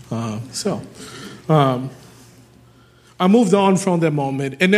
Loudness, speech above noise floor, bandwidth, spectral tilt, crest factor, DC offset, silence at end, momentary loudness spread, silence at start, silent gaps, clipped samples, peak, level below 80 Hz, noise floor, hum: -18 LUFS; 33 dB; 14 kHz; -6 dB/octave; 18 dB; under 0.1%; 0 s; 19 LU; 0.1 s; none; under 0.1%; -2 dBFS; -60 dBFS; -50 dBFS; none